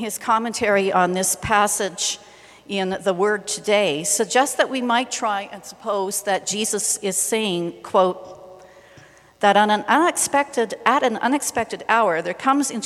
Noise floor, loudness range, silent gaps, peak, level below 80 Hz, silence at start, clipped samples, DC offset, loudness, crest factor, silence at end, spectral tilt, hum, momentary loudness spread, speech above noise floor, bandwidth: -49 dBFS; 3 LU; none; 0 dBFS; -58 dBFS; 0 s; under 0.1%; under 0.1%; -20 LUFS; 22 dB; 0 s; -2.5 dB/octave; none; 7 LU; 28 dB; 15.5 kHz